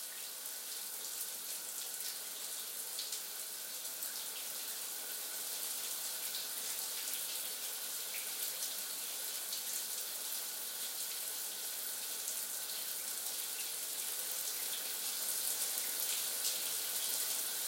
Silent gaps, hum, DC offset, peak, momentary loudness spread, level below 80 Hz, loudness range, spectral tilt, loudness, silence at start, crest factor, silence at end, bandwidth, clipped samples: none; none; under 0.1%; -18 dBFS; 6 LU; under -90 dBFS; 5 LU; 2.5 dB/octave; -38 LUFS; 0 s; 22 dB; 0 s; 16.5 kHz; under 0.1%